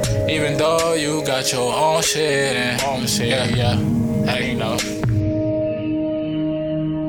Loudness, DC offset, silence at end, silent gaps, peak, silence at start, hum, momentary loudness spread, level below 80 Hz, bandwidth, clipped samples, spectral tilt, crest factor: -19 LUFS; under 0.1%; 0 s; none; -6 dBFS; 0 s; none; 5 LU; -40 dBFS; 19 kHz; under 0.1%; -4.5 dB/octave; 14 dB